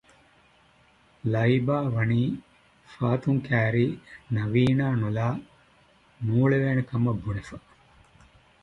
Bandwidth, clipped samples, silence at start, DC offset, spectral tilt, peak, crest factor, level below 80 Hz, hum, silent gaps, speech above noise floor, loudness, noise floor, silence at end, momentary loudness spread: 7.4 kHz; under 0.1%; 1.25 s; under 0.1%; -9 dB/octave; -10 dBFS; 18 dB; -54 dBFS; none; none; 35 dB; -26 LUFS; -60 dBFS; 1.05 s; 12 LU